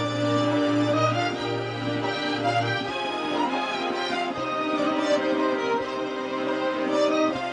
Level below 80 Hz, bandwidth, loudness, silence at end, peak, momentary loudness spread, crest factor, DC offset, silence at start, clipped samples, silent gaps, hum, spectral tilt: -62 dBFS; 10 kHz; -25 LUFS; 0 s; -12 dBFS; 5 LU; 14 dB; under 0.1%; 0 s; under 0.1%; none; none; -5.5 dB/octave